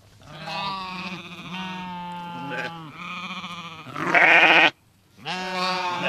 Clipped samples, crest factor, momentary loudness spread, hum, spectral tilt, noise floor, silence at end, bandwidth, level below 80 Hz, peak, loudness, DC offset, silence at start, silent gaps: under 0.1%; 24 dB; 21 LU; none; -3.5 dB/octave; -55 dBFS; 0 s; 15 kHz; -64 dBFS; -2 dBFS; -20 LUFS; under 0.1%; 0.25 s; none